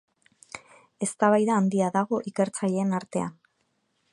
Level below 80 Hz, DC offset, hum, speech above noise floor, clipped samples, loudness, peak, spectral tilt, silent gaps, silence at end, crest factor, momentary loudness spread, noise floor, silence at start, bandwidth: -72 dBFS; under 0.1%; none; 49 dB; under 0.1%; -26 LUFS; -8 dBFS; -6 dB/octave; none; 0.8 s; 20 dB; 21 LU; -73 dBFS; 0.55 s; 11.5 kHz